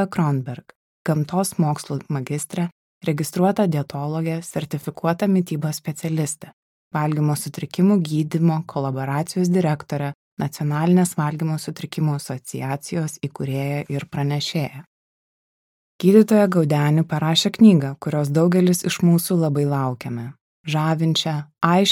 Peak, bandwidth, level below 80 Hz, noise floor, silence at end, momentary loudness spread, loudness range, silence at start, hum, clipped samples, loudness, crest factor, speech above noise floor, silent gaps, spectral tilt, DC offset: -2 dBFS; 16.5 kHz; -64 dBFS; under -90 dBFS; 0 s; 12 LU; 8 LU; 0 s; none; under 0.1%; -21 LUFS; 18 dB; over 70 dB; 0.76-1.05 s, 2.72-3.01 s, 6.53-6.91 s, 10.15-10.37 s, 14.87-15.99 s, 20.41-20.64 s; -6 dB/octave; under 0.1%